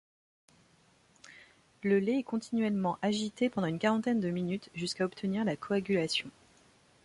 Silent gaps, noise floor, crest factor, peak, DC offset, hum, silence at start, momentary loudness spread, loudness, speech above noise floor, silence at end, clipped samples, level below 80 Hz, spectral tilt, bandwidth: none; -66 dBFS; 16 dB; -16 dBFS; under 0.1%; none; 1.3 s; 7 LU; -32 LUFS; 34 dB; 0.75 s; under 0.1%; -70 dBFS; -5.5 dB/octave; 11.5 kHz